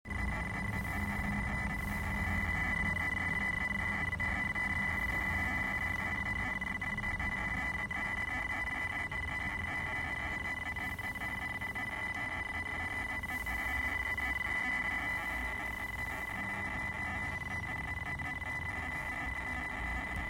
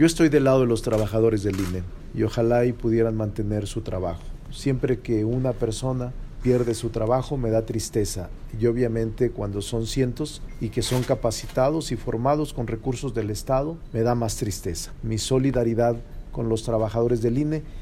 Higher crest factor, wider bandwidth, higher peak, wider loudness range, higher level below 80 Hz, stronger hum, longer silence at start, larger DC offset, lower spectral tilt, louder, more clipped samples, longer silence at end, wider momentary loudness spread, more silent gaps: about the same, 14 dB vs 16 dB; about the same, 16 kHz vs 16 kHz; second, -22 dBFS vs -6 dBFS; about the same, 4 LU vs 2 LU; second, -46 dBFS vs -38 dBFS; neither; about the same, 0.05 s vs 0 s; neither; about the same, -5 dB/octave vs -6 dB/octave; second, -35 LUFS vs -24 LUFS; neither; about the same, 0 s vs 0 s; second, 5 LU vs 9 LU; neither